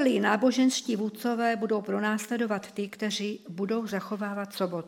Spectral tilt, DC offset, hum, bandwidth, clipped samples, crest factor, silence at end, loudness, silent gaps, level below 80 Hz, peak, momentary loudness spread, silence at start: -4.5 dB/octave; under 0.1%; none; 16.5 kHz; under 0.1%; 20 dB; 0 s; -29 LUFS; none; -80 dBFS; -8 dBFS; 9 LU; 0 s